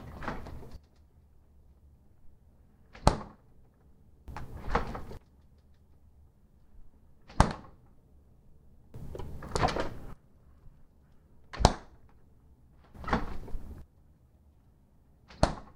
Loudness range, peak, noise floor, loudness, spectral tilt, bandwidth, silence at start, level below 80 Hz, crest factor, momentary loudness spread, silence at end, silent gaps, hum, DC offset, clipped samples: 8 LU; 0 dBFS; -62 dBFS; -33 LUFS; -5.5 dB/octave; 15 kHz; 0 s; -42 dBFS; 36 dB; 25 LU; 0.05 s; none; none; under 0.1%; under 0.1%